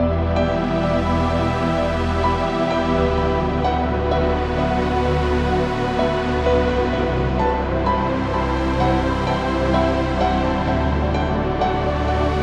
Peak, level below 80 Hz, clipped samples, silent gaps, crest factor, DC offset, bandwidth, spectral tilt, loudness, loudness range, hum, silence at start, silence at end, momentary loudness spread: -4 dBFS; -26 dBFS; under 0.1%; none; 14 dB; under 0.1%; 9.2 kHz; -7.5 dB/octave; -20 LUFS; 0 LU; none; 0 s; 0 s; 2 LU